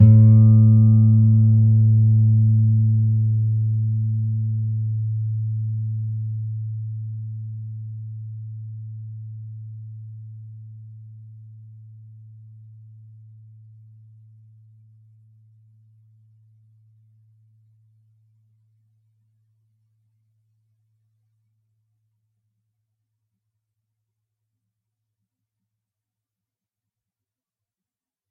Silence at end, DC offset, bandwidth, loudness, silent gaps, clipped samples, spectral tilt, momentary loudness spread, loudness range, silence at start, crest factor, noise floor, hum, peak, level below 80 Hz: 17.05 s; under 0.1%; 1.3 kHz; -18 LUFS; none; under 0.1%; -16.5 dB/octave; 24 LU; 26 LU; 0 s; 20 dB; under -90 dBFS; none; -2 dBFS; -64 dBFS